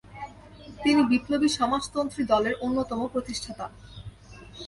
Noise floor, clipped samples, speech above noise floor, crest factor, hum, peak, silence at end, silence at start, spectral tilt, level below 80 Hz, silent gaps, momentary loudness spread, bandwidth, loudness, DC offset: -47 dBFS; under 0.1%; 21 dB; 18 dB; none; -10 dBFS; 0 s; 0.05 s; -4.5 dB/octave; -52 dBFS; none; 22 LU; 11.5 kHz; -26 LUFS; under 0.1%